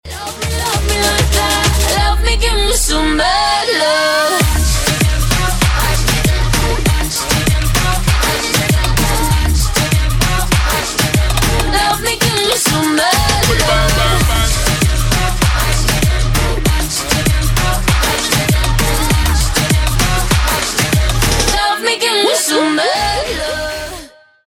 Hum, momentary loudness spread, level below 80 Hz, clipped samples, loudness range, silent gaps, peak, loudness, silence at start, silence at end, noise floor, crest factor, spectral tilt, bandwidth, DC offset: none; 3 LU; -18 dBFS; under 0.1%; 2 LU; none; -2 dBFS; -13 LUFS; 0.05 s; 0.4 s; -35 dBFS; 12 dB; -3.5 dB/octave; 18 kHz; under 0.1%